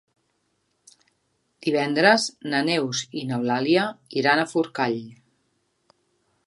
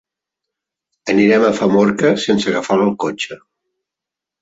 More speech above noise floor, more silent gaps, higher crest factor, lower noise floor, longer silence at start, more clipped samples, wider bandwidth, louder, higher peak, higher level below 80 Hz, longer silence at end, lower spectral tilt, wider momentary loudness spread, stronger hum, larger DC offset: second, 49 dB vs 71 dB; neither; first, 24 dB vs 16 dB; second, -72 dBFS vs -85 dBFS; first, 1.65 s vs 1.05 s; neither; first, 11.5 kHz vs 8 kHz; second, -23 LUFS vs -15 LUFS; about the same, -2 dBFS vs -2 dBFS; second, -74 dBFS vs -56 dBFS; first, 1.35 s vs 1.05 s; second, -4 dB/octave vs -5.5 dB/octave; about the same, 10 LU vs 11 LU; neither; neither